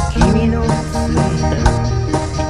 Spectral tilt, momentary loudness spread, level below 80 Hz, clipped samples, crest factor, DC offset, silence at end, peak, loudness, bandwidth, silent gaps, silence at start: -6.5 dB/octave; 5 LU; -20 dBFS; under 0.1%; 14 dB; 0.8%; 0 s; 0 dBFS; -16 LUFS; 11.5 kHz; none; 0 s